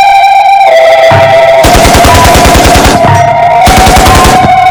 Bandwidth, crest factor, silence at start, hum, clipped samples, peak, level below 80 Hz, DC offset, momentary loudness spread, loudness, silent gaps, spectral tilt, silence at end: over 20 kHz; 2 dB; 0 s; none; 50%; 0 dBFS; -14 dBFS; 1%; 2 LU; -2 LUFS; none; -4 dB/octave; 0 s